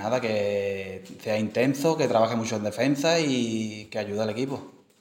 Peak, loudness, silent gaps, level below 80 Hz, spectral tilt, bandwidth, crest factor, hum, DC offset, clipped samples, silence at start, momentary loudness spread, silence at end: -8 dBFS; -26 LUFS; none; -70 dBFS; -5 dB/octave; 17 kHz; 18 dB; none; under 0.1%; under 0.1%; 0 s; 10 LU; 0.3 s